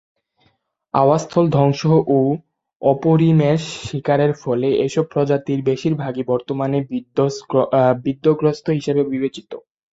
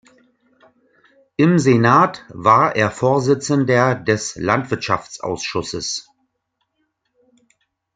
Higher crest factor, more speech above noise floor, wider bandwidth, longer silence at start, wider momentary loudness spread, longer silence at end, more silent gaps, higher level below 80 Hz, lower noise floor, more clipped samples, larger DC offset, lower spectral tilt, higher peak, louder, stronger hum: about the same, 16 dB vs 18 dB; second, 46 dB vs 56 dB; second, 8 kHz vs 9.4 kHz; second, 0.95 s vs 1.4 s; second, 8 LU vs 11 LU; second, 0.35 s vs 1.95 s; first, 2.76-2.80 s vs none; about the same, -56 dBFS vs -56 dBFS; second, -63 dBFS vs -73 dBFS; neither; neither; first, -7.5 dB/octave vs -5.5 dB/octave; about the same, -2 dBFS vs 0 dBFS; about the same, -18 LUFS vs -17 LUFS; neither